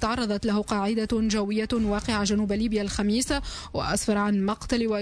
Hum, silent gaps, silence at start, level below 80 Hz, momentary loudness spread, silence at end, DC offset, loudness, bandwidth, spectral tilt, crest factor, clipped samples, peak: none; none; 0 s; -40 dBFS; 3 LU; 0 s; under 0.1%; -26 LUFS; 11 kHz; -4.5 dB/octave; 12 dB; under 0.1%; -14 dBFS